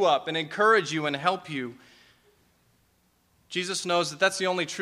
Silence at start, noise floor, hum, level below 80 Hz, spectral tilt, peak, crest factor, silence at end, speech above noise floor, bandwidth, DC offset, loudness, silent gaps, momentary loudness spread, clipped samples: 0 s; -67 dBFS; 60 Hz at -65 dBFS; -74 dBFS; -3 dB/octave; -8 dBFS; 20 dB; 0 s; 41 dB; 15.5 kHz; under 0.1%; -26 LUFS; none; 13 LU; under 0.1%